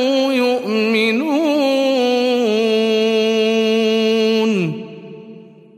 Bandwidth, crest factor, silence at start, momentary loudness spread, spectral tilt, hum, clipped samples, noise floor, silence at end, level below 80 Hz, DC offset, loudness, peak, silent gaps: 15.5 kHz; 12 dB; 0 s; 5 LU; -5 dB/octave; none; under 0.1%; -39 dBFS; 0.35 s; -72 dBFS; under 0.1%; -16 LUFS; -4 dBFS; none